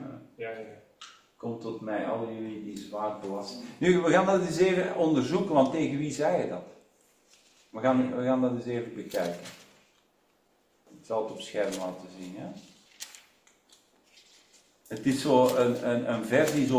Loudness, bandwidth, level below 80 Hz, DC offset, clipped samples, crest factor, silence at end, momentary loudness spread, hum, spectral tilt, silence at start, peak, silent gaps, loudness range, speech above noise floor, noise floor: -28 LUFS; 16 kHz; -68 dBFS; under 0.1%; under 0.1%; 22 dB; 0 s; 20 LU; none; -5.5 dB/octave; 0 s; -8 dBFS; none; 11 LU; 41 dB; -68 dBFS